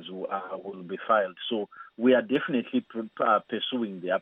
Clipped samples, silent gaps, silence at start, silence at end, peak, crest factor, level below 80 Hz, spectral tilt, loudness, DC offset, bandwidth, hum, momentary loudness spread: under 0.1%; none; 0 s; 0 s; -10 dBFS; 18 dB; -78 dBFS; -8 dB/octave; -28 LUFS; under 0.1%; 3.9 kHz; none; 14 LU